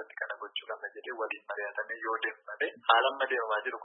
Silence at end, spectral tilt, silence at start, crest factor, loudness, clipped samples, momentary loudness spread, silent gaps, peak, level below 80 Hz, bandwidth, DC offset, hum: 0 s; -4 dB/octave; 0 s; 26 dB; -32 LUFS; under 0.1%; 13 LU; none; -8 dBFS; under -90 dBFS; 4.1 kHz; under 0.1%; none